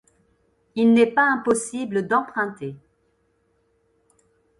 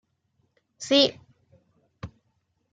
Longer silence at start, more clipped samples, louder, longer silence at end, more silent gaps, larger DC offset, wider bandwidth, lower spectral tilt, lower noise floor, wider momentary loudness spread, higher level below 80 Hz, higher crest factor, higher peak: about the same, 0.75 s vs 0.8 s; neither; about the same, -21 LUFS vs -22 LUFS; first, 1.85 s vs 0.65 s; neither; neither; first, 11.5 kHz vs 9.4 kHz; first, -5 dB/octave vs -3.5 dB/octave; second, -67 dBFS vs -73 dBFS; second, 16 LU vs 24 LU; about the same, -66 dBFS vs -62 dBFS; second, 20 dB vs 26 dB; about the same, -4 dBFS vs -4 dBFS